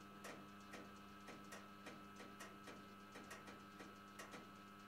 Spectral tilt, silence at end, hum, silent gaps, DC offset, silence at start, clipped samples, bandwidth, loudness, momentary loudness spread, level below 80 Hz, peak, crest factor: -4 dB/octave; 0 s; none; none; under 0.1%; 0 s; under 0.1%; 16 kHz; -57 LUFS; 2 LU; -82 dBFS; -40 dBFS; 18 dB